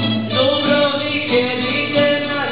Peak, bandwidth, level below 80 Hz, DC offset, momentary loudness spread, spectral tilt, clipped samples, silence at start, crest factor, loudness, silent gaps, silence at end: -2 dBFS; 5.2 kHz; -54 dBFS; 0.8%; 3 LU; -9 dB/octave; under 0.1%; 0 s; 14 dB; -16 LUFS; none; 0 s